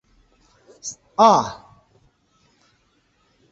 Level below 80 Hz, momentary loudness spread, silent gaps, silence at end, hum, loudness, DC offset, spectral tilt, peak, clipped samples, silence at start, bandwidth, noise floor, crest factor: -62 dBFS; 20 LU; none; 2 s; none; -17 LUFS; under 0.1%; -4 dB/octave; -2 dBFS; under 0.1%; 0.85 s; 8.2 kHz; -64 dBFS; 22 dB